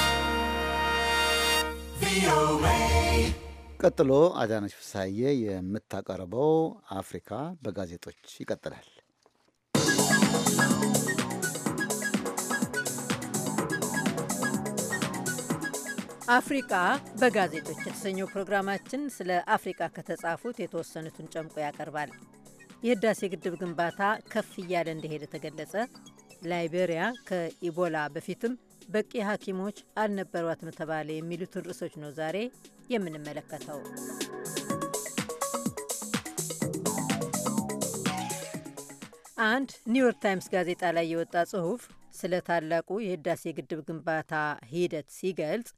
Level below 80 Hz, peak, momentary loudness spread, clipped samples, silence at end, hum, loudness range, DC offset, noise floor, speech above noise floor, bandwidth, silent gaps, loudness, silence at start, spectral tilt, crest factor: -46 dBFS; -8 dBFS; 14 LU; under 0.1%; 0.1 s; none; 9 LU; under 0.1%; -68 dBFS; 38 dB; 15.5 kHz; none; -30 LUFS; 0 s; -4 dB/octave; 22 dB